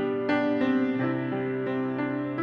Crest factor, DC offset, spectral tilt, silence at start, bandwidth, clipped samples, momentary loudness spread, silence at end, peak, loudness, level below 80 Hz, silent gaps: 12 dB; under 0.1%; -8.5 dB/octave; 0 s; 6.2 kHz; under 0.1%; 5 LU; 0 s; -14 dBFS; -27 LUFS; -66 dBFS; none